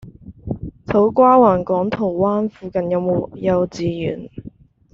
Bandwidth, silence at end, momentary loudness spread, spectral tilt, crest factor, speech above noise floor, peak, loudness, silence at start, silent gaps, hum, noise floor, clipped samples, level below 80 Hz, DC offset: 7.4 kHz; 0.45 s; 18 LU; -7.5 dB/octave; 16 dB; 25 dB; -2 dBFS; -17 LUFS; 0.05 s; none; none; -41 dBFS; under 0.1%; -46 dBFS; under 0.1%